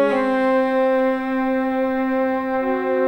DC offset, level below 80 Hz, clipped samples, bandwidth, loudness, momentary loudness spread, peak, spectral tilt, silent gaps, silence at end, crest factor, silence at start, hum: under 0.1%; -52 dBFS; under 0.1%; 16.5 kHz; -20 LUFS; 3 LU; -6 dBFS; -6.5 dB/octave; none; 0 s; 12 dB; 0 s; none